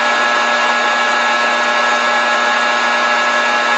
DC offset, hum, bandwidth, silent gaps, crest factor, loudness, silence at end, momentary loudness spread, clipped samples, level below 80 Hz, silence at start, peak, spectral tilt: under 0.1%; none; 9.2 kHz; none; 12 dB; -13 LUFS; 0 s; 0 LU; under 0.1%; -64 dBFS; 0 s; -2 dBFS; 0 dB/octave